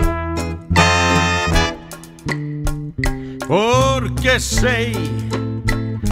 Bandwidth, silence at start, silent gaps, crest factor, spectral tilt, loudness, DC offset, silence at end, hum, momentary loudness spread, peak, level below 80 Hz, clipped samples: 16.5 kHz; 0 s; none; 18 dB; -4.5 dB/octave; -18 LUFS; under 0.1%; 0 s; none; 11 LU; 0 dBFS; -26 dBFS; under 0.1%